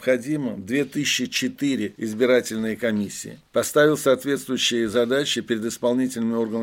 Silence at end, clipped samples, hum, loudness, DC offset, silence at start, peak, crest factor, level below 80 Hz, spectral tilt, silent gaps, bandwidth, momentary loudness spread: 0 s; under 0.1%; none; -23 LUFS; under 0.1%; 0 s; -6 dBFS; 16 dB; -64 dBFS; -4 dB/octave; none; 17 kHz; 8 LU